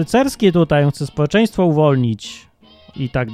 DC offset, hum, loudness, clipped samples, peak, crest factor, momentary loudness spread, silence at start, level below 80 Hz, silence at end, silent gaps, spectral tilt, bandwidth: under 0.1%; none; -16 LUFS; under 0.1%; 0 dBFS; 16 dB; 11 LU; 0 s; -42 dBFS; 0 s; none; -7 dB/octave; 15 kHz